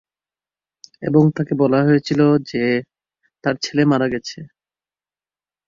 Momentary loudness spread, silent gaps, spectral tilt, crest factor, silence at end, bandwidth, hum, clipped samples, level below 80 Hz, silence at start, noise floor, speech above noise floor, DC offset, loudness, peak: 11 LU; none; -7 dB/octave; 18 dB; 1.2 s; 7.4 kHz; none; under 0.1%; -58 dBFS; 1 s; under -90 dBFS; over 73 dB; under 0.1%; -18 LUFS; -2 dBFS